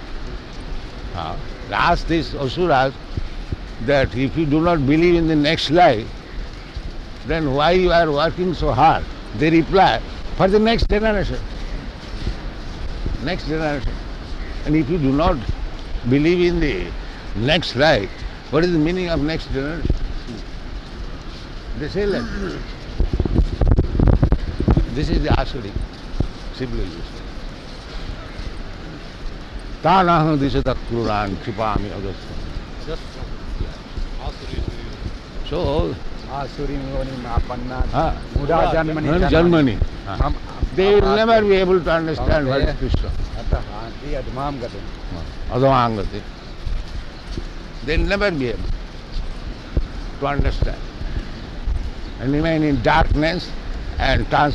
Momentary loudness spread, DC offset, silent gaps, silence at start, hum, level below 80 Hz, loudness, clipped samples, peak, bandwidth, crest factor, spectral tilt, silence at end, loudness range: 18 LU; under 0.1%; none; 0 s; none; -26 dBFS; -20 LUFS; under 0.1%; 0 dBFS; 9.6 kHz; 20 dB; -7 dB/octave; 0 s; 10 LU